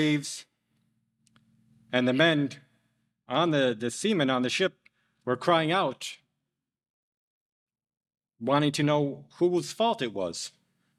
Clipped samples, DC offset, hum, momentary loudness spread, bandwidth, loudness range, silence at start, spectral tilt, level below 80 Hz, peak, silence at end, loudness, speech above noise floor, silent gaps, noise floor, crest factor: under 0.1%; under 0.1%; 60 Hz at -60 dBFS; 13 LU; 13.5 kHz; 4 LU; 0 s; -5 dB/octave; -76 dBFS; -8 dBFS; 0.5 s; -27 LUFS; 58 dB; 6.90-7.67 s; -85 dBFS; 22 dB